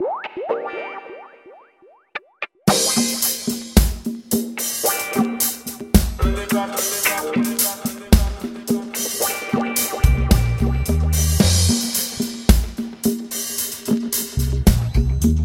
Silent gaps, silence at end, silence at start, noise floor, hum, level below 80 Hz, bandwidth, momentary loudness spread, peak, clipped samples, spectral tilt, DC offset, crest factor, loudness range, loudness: none; 0 s; 0 s; -52 dBFS; none; -24 dBFS; 17 kHz; 12 LU; 0 dBFS; under 0.1%; -4 dB/octave; under 0.1%; 20 dB; 3 LU; -20 LUFS